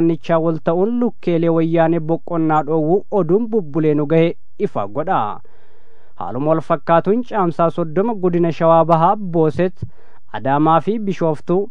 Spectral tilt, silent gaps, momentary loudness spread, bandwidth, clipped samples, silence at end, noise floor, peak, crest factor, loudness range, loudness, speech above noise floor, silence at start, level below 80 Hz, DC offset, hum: -9.5 dB/octave; none; 8 LU; 6.8 kHz; under 0.1%; 0 s; -53 dBFS; 0 dBFS; 16 dB; 4 LU; -17 LUFS; 37 dB; 0 s; -58 dBFS; 5%; none